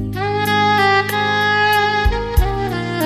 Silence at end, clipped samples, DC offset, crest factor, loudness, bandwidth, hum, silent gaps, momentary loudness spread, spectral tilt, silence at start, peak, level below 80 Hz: 0 s; under 0.1%; under 0.1%; 14 dB; -16 LUFS; 16 kHz; none; none; 7 LU; -5 dB/octave; 0 s; -2 dBFS; -26 dBFS